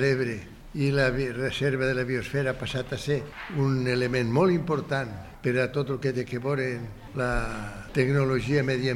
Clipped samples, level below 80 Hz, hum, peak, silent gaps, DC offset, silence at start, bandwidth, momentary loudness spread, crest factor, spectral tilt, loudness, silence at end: under 0.1%; -44 dBFS; none; -10 dBFS; none; under 0.1%; 0 s; 12.5 kHz; 8 LU; 18 dB; -6.5 dB/octave; -27 LUFS; 0 s